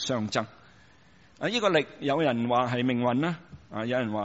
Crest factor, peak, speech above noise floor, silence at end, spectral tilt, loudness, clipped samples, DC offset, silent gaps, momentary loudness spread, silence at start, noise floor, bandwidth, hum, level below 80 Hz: 20 dB; -10 dBFS; 31 dB; 0 s; -4 dB/octave; -27 LUFS; under 0.1%; under 0.1%; none; 10 LU; 0 s; -58 dBFS; 8 kHz; none; -64 dBFS